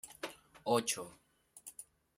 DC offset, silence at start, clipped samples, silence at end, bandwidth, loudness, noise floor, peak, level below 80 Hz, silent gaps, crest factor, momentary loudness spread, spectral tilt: under 0.1%; 0.05 s; under 0.1%; 0.35 s; 16 kHz; -37 LUFS; -58 dBFS; -18 dBFS; -78 dBFS; none; 24 dB; 19 LU; -3 dB/octave